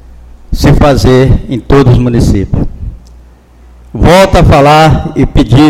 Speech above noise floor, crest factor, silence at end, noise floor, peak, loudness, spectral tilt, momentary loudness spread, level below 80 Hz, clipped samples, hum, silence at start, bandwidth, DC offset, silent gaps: 31 dB; 6 dB; 0 s; -36 dBFS; 0 dBFS; -6 LUFS; -7 dB/octave; 14 LU; -16 dBFS; 4%; none; 0.5 s; 16 kHz; under 0.1%; none